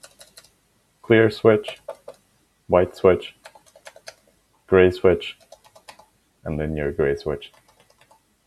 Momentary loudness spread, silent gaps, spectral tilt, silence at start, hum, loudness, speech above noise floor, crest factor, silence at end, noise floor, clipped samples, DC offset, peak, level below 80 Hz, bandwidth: 22 LU; none; -7 dB/octave; 1.1 s; none; -20 LUFS; 45 dB; 22 dB; 1 s; -64 dBFS; under 0.1%; under 0.1%; -2 dBFS; -46 dBFS; 12.5 kHz